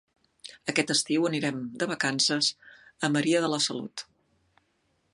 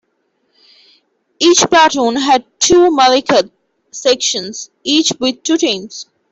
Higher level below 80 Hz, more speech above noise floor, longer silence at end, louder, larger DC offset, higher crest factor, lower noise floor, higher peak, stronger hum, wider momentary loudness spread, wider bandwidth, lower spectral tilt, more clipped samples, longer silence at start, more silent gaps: second, -74 dBFS vs -50 dBFS; second, 45 dB vs 52 dB; first, 1.1 s vs 0.3 s; second, -27 LUFS vs -12 LUFS; neither; first, 20 dB vs 14 dB; first, -72 dBFS vs -64 dBFS; second, -8 dBFS vs 0 dBFS; neither; about the same, 13 LU vs 15 LU; first, 11.5 kHz vs 8.2 kHz; about the same, -3 dB/octave vs -2 dB/octave; neither; second, 0.45 s vs 1.4 s; neither